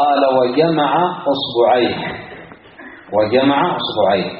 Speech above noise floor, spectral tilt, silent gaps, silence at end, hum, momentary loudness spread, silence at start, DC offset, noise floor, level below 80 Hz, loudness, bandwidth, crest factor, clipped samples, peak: 23 dB; -3.5 dB/octave; none; 0 s; none; 11 LU; 0 s; under 0.1%; -38 dBFS; -54 dBFS; -16 LUFS; 5.4 kHz; 14 dB; under 0.1%; -2 dBFS